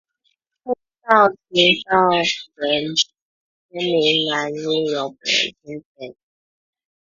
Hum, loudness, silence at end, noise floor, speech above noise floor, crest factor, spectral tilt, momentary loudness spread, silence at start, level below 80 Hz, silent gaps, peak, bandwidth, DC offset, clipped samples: none; -18 LUFS; 0.9 s; -70 dBFS; 50 dB; 20 dB; -3 dB/octave; 21 LU; 0.65 s; -62 dBFS; 3.22-3.69 s, 5.85-5.95 s; 0 dBFS; 7.6 kHz; under 0.1%; under 0.1%